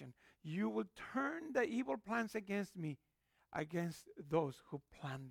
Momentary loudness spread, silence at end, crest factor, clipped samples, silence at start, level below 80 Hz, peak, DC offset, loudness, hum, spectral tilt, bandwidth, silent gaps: 13 LU; 0 s; 20 dB; under 0.1%; 0 s; -76 dBFS; -22 dBFS; under 0.1%; -42 LUFS; none; -6.5 dB/octave; 18.5 kHz; none